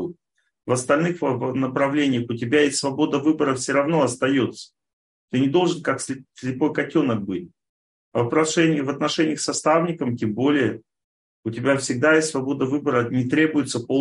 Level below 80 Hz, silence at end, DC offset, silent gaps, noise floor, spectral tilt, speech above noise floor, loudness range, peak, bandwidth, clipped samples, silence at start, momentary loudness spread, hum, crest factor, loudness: -64 dBFS; 0 s; under 0.1%; 4.93-5.28 s, 7.69-8.12 s, 11.04-11.43 s; -67 dBFS; -5 dB/octave; 46 dB; 3 LU; -4 dBFS; 11.5 kHz; under 0.1%; 0 s; 9 LU; none; 18 dB; -22 LUFS